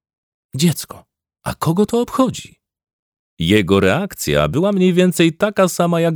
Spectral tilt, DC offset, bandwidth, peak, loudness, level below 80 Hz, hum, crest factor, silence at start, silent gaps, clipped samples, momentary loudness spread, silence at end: -5.5 dB/octave; under 0.1%; over 20 kHz; -2 dBFS; -16 LUFS; -44 dBFS; none; 16 dB; 0.55 s; 2.93-3.12 s, 3.19-3.37 s; under 0.1%; 13 LU; 0 s